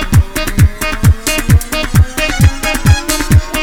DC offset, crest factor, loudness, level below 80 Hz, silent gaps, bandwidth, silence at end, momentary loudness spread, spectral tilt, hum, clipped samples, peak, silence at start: under 0.1%; 10 dB; -12 LUFS; -16 dBFS; none; 18 kHz; 0 s; 2 LU; -5 dB/octave; none; 1%; 0 dBFS; 0 s